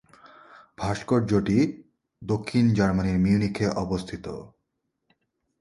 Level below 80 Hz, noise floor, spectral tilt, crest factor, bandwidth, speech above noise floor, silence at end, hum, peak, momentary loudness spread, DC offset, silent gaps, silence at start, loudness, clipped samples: -46 dBFS; -78 dBFS; -7.5 dB/octave; 18 dB; 11.5 kHz; 55 dB; 1.15 s; none; -8 dBFS; 15 LU; under 0.1%; none; 0.25 s; -25 LUFS; under 0.1%